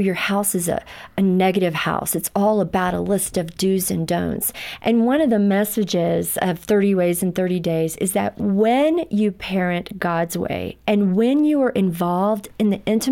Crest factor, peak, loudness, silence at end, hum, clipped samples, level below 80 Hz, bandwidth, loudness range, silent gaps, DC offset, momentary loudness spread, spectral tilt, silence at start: 14 dB; -6 dBFS; -20 LUFS; 0 s; none; under 0.1%; -50 dBFS; 17 kHz; 1 LU; none; under 0.1%; 6 LU; -5.5 dB/octave; 0 s